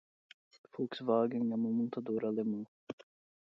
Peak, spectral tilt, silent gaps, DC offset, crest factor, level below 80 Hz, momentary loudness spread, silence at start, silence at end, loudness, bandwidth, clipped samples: -18 dBFS; -6.5 dB/octave; 2.68-2.87 s; under 0.1%; 18 dB; -84 dBFS; 18 LU; 0.75 s; 0.5 s; -35 LUFS; 6 kHz; under 0.1%